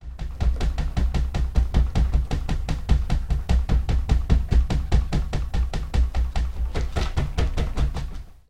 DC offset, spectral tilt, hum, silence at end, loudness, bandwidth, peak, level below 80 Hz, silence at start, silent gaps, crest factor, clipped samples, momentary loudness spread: 1%; -6.5 dB/octave; none; 0 s; -25 LUFS; 9.4 kHz; -6 dBFS; -22 dBFS; 0 s; none; 16 dB; under 0.1%; 5 LU